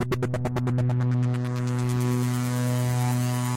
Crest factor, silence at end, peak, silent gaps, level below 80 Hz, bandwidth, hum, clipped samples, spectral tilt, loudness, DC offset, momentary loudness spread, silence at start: 10 dB; 0 s; -16 dBFS; none; -50 dBFS; 16.5 kHz; none; under 0.1%; -6.5 dB/octave; -25 LUFS; under 0.1%; 3 LU; 0 s